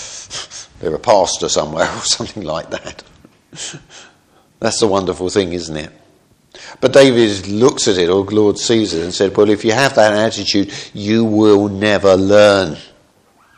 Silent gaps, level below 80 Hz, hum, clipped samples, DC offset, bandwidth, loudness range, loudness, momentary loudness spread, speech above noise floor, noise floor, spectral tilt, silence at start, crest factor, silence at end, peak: none; -48 dBFS; none; under 0.1%; under 0.1%; 12 kHz; 8 LU; -14 LUFS; 17 LU; 38 dB; -52 dBFS; -4 dB/octave; 0 s; 14 dB; 0.7 s; 0 dBFS